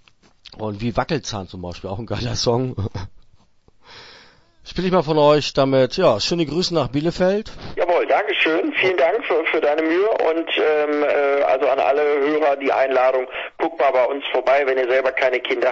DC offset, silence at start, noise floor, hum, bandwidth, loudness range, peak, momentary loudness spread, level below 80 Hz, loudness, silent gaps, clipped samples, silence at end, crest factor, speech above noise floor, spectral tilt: under 0.1%; 0.5 s; -54 dBFS; none; 8 kHz; 7 LU; -2 dBFS; 11 LU; -46 dBFS; -19 LUFS; none; under 0.1%; 0 s; 16 dB; 35 dB; -5 dB/octave